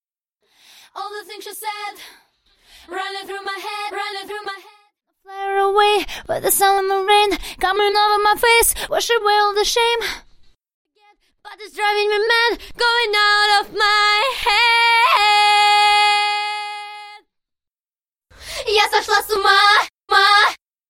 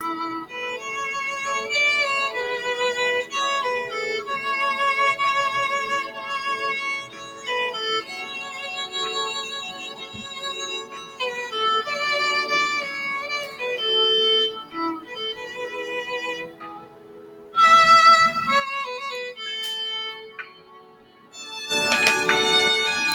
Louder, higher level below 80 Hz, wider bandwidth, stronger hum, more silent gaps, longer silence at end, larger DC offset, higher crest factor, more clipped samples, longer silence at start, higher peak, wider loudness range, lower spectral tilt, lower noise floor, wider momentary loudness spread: first, -15 LUFS vs -21 LUFS; first, -48 dBFS vs -64 dBFS; about the same, 16.5 kHz vs 17.5 kHz; neither; first, 10.74-10.85 s vs none; first, 0.35 s vs 0 s; neither; about the same, 18 dB vs 20 dB; neither; first, 0.95 s vs 0 s; about the same, 0 dBFS vs -2 dBFS; first, 15 LU vs 10 LU; about the same, 0 dB/octave vs -1 dB/octave; first, under -90 dBFS vs -50 dBFS; first, 17 LU vs 14 LU